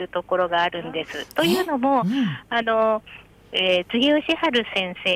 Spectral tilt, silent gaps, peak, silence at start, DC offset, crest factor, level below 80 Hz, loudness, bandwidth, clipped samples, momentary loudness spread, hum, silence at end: -5 dB/octave; none; -10 dBFS; 0 s; under 0.1%; 12 dB; -58 dBFS; -22 LUFS; 16.5 kHz; under 0.1%; 8 LU; none; 0 s